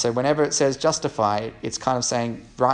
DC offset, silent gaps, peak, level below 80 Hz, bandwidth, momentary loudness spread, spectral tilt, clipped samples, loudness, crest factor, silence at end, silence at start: under 0.1%; none; -4 dBFS; -54 dBFS; 10.5 kHz; 7 LU; -4 dB/octave; under 0.1%; -23 LUFS; 18 dB; 0 s; 0 s